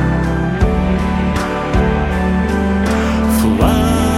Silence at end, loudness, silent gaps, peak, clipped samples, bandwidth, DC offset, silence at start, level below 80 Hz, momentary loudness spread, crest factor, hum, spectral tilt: 0 s; -15 LUFS; none; -2 dBFS; under 0.1%; 16.5 kHz; under 0.1%; 0 s; -20 dBFS; 4 LU; 12 dB; none; -6.5 dB/octave